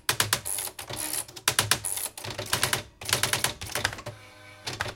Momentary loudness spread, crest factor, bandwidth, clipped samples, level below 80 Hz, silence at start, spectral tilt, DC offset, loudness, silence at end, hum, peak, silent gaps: 14 LU; 28 dB; 17 kHz; under 0.1%; -54 dBFS; 0.1 s; -1 dB/octave; under 0.1%; -27 LUFS; 0 s; none; -4 dBFS; none